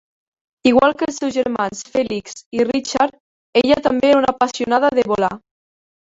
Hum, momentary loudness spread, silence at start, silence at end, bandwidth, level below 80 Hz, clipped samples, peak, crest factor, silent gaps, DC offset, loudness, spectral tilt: none; 8 LU; 0.65 s; 0.75 s; 8 kHz; -52 dBFS; under 0.1%; -2 dBFS; 16 dB; 2.46-2.51 s, 3.20-3.53 s; under 0.1%; -18 LUFS; -4 dB/octave